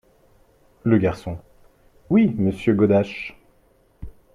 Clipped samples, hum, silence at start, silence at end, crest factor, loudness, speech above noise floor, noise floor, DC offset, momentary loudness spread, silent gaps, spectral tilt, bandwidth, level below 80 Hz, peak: under 0.1%; none; 0.85 s; 0.25 s; 18 dB; -21 LUFS; 40 dB; -59 dBFS; under 0.1%; 16 LU; none; -9 dB/octave; 10.5 kHz; -48 dBFS; -4 dBFS